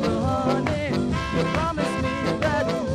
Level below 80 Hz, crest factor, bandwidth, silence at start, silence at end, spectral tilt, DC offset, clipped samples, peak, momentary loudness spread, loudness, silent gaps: -40 dBFS; 14 dB; 14.5 kHz; 0 s; 0 s; -6 dB/octave; under 0.1%; under 0.1%; -10 dBFS; 2 LU; -24 LUFS; none